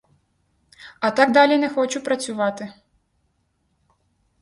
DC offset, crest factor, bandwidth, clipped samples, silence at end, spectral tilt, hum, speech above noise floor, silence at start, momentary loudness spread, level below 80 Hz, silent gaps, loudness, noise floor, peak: under 0.1%; 22 dB; 11.5 kHz; under 0.1%; 1.7 s; -3.5 dB/octave; none; 50 dB; 0.85 s; 11 LU; -68 dBFS; none; -19 LUFS; -69 dBFS; 0 dBFS